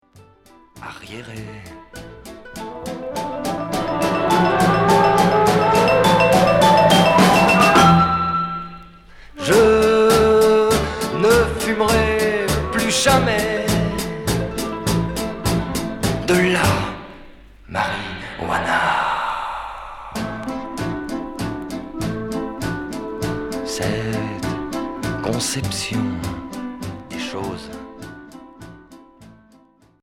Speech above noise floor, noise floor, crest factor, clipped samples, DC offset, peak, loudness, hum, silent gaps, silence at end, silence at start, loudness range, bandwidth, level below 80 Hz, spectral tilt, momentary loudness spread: 19 dB; -53 dBFS; 18 dB; under 0.1%; under 0.1%; -2 dBFS; -18 LUFS; none; none; 0.75 s; 0.75 s; 13 LU; 17 kHz; -38 dBFS; -4.5 dB/octave; 20 LU